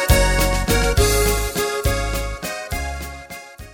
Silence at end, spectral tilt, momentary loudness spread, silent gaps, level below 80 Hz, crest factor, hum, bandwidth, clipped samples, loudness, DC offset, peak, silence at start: 0 s; -4 dB/octave; 16 LU; none; -24 dBFS; 18 dB; none; 17 kHz; under 0.1%; -20 LUFS; under 0.1%; -2 dBFS; 0 s